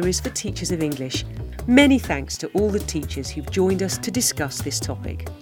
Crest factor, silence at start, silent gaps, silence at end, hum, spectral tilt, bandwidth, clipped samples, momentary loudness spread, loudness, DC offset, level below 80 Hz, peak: 22 dB; 0 s; none; 0 s; none; -4 dB/octave; over 20 kHz; under 0.1%; 13 LU; -22 LUFS; under 0.1%; -36 dBFS; 0 dBFS